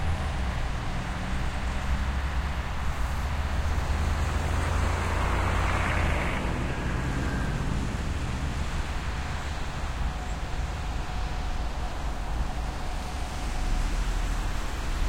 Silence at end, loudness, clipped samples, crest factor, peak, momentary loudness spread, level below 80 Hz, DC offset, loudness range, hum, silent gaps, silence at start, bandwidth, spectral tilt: 0 s; -31 LUFS; under 0.1%; 14 dB; -14 dBFS; 7 LU; -30 dBFS; under 0.1%; 6 LU; none; none; 0 s; 16 kHz; -5.5 dB/octave